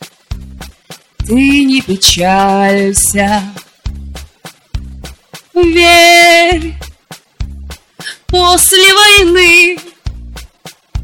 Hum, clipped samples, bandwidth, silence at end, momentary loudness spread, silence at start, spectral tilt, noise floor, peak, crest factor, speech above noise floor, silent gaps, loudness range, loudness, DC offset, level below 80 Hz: none; under 0.1%; 17.5 kHz; 0 s; 24 LU; 0 s; -2.5 dB/octave; -37 dBFS; 0 dBFS; 10 dB; 29 dB; none; 6 LU; -6 LUFS; under 0.1%; -28 dBFS